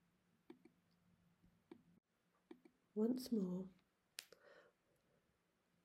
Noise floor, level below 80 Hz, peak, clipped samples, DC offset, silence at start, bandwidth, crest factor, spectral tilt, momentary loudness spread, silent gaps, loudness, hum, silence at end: -83 dBFS; -88 dBFS; -24 dBFS; under 0.1%; under 0.1%; 0.5 s; 15.5 kHz; 26 dB; -6.5 dB/octave; 25 LU; none; -46 LUFS; none; 1.25 s